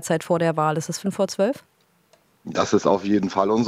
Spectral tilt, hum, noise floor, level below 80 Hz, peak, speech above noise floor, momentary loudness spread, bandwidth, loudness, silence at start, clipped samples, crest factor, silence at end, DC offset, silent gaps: -5.5 dB/octave; none; -60 dBFS; -62 dBFS; -4 dBFS; 39 dB; 8 LU; 15.5 kHz; -22 LUFS; 0 s; under 0.1%; 18 dB; 0 s; under 0.1%; none